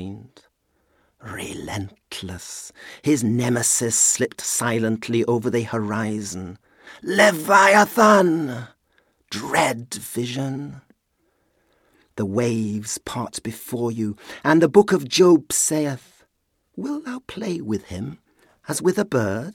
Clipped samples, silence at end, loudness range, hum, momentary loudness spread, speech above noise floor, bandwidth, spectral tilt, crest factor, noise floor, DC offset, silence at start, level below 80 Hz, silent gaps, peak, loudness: under 0.1%; 0 s; 10 LU; none; 19 LU; 49 dB; 18 kHz; -4 dB/octave; 20 dB; -70 dBFS; under 0.1%; 0 s; -58 dBFS; none; -2 dBFS; -20 LUFS